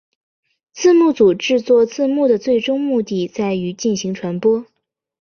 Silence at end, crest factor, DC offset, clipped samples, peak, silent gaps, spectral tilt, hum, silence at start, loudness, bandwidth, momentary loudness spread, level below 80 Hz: 0.6 s; 14 dB; under 0.1%; under 0.1%; -4 dBFS; none; -5.5 dB/octave; none; 0.75 s; -16 LUFS; 7 kHz; 8 LU; -58 dBFS